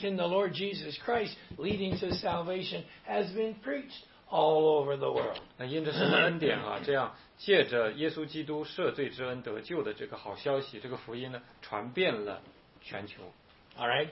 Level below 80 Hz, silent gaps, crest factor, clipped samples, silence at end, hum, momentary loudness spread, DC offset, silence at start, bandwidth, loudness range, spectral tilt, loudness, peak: -64 dBFS; none; 20 dB; under 0.1%; 0 s; none; 15 LU; under 0.1%; 0 s; 5.8 kHz; 7 LU; -9 dB/octave; -32 LUFS; -12 dBFS